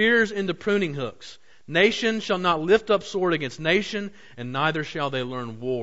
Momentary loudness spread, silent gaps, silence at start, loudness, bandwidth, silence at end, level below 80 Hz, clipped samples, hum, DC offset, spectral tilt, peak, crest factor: 12 LU; none; 0 s; -24 LUFS; 8 kHz; 0 s; -58 dBFS; under 0.1%; none; 0.5%; -5 dB/octave; -6 dBFS; 18 dB